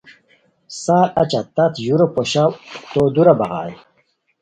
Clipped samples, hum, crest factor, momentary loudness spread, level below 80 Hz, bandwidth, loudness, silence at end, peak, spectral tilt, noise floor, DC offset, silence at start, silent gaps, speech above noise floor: under 0.1%; none; 18 dB; 14 LU; -54 dBFS; 9.4 kHz; -17 LUFS; 0.65 s; 0 dBFS; -6 dB/octave; -63 dBFS; under 0.1%; 0.7 s; none; 47 dB